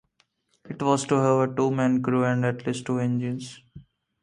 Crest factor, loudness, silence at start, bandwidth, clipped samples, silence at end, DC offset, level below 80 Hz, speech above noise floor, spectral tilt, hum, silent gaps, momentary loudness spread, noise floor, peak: 18 dB; -24 LUFS; 0.65 s; 11 kHz; under 0.1%; 0.4 s; under 0.1%; -64 dBFS; 45 dB; -6.5 dB/octave; none; none; 10 LU; -69 dBFS; -6 dBFS